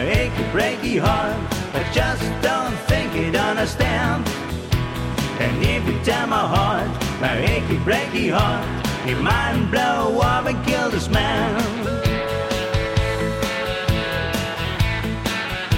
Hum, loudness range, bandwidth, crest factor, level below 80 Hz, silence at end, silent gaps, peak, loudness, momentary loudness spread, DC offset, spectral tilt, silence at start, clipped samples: none; 2 LU; 16.5 kHz; 16 dB; -32 dBFS; 0 s; none; -6 dBFS; -21 LUFS; 5 LU; under 0.1%; -5.5 dB/octave; 0 s; under 0.1%